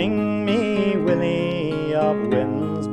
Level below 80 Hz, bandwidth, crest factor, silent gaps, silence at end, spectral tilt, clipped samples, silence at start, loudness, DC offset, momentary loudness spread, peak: -52 dBFS; 9 kHz; 14 dB; none; 0 s; -7.5 dB/octave; under 0.1%; 0 s; -21 LUFS; under 0.1%; 4 LU; -8 dBFS